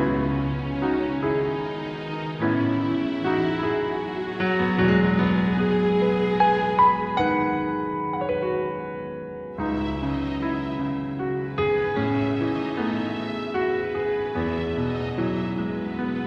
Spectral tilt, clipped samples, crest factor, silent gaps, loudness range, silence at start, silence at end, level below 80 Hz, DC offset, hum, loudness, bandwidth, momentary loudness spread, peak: -8.5 dB/octave; under 0.1%; 16 dB; none; 6 LU; 0 s; 0 s; -44 dBFS; under 0.1%; none; -24 LUFS; 6.8 kHz; 9 LU; -8 dBFS